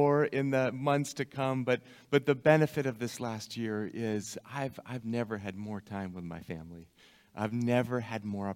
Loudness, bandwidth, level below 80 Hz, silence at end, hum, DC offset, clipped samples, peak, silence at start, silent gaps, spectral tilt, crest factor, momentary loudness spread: -32 LUFS; 16.5 kHz; -68 dBFS; 0 s; none; under 0.1%; under 0.1%; -8 dBFS; 0 s; none; -6 dB/octave; 22 dB; 15 LU